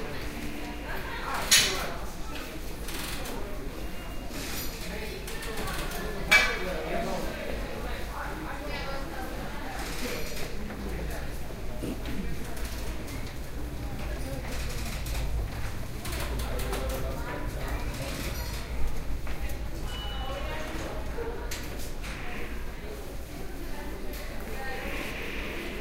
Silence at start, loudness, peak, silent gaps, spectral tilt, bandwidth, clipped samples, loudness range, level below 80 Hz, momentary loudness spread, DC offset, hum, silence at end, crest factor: 0 s; -33 LUFS; -6 dBFS; none; -3 dB/octave; 16 kHz; under 0.1%; 9 LU; -36 dBFS; 7 LU; under 0.1%; none; 0 s; 24 dB